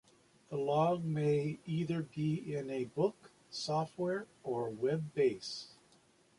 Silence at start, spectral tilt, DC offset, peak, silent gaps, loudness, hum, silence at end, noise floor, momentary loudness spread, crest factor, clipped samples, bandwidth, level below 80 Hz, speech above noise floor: 0.5 s; -6.5 dB/octave; under 0.1%; -20 dBFS; none; -36 LUFS; none; 0.65 s; -68 dBFS; 10 LU; 16 dB; under 0.1%; 11.5 kHz; -74 dBFS; 32 dB